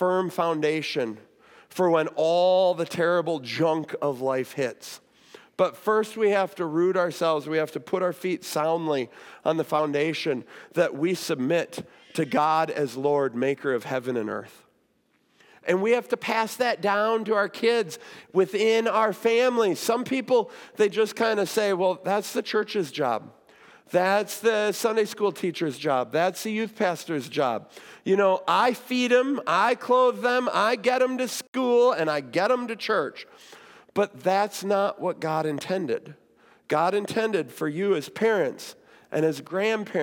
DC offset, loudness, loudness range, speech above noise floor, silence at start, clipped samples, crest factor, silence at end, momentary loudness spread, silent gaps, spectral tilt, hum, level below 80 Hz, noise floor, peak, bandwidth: under 0.1%; -25 LUFS; 4 LU; 43 dB; 0 s; under 0.1%; 16 dB; 0 s; 8 LU; 31.48-31.53 s; -4.5 dB/octave; none; -80 dBFS; -68 dBFS; -8 dBFS; 18 kHz